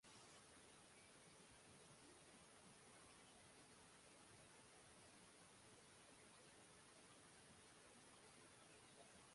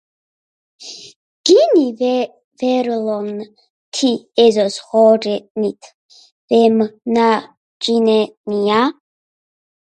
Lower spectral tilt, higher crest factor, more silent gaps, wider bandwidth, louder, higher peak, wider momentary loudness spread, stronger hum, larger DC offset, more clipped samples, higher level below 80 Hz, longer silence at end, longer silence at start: second, -2.5 dB/octave vs -4.5 dB/octave; about the same, 16 dB vs 16 dB; second, none vs 1.16-1.44 s, 2.44-2.51 s, 3.70-3.92 s, 5.50-5.55 s, 5.94-6.09 s, 6.32-6.48 s, 7.57-7.80 s, 8.37-8.44 s; about the same, 11.5 kHz vs 11 kHz; second, -66 LUFS vs -16 LUFS; second, -52 dBFS vs 0 dBFS; second, 1 LU vs 14 LU; neither; neither; neither; second, -86 dBFS vs -68 dBFS; second, 0 s vs 0.9 s; second, 0 s vs 0.8 s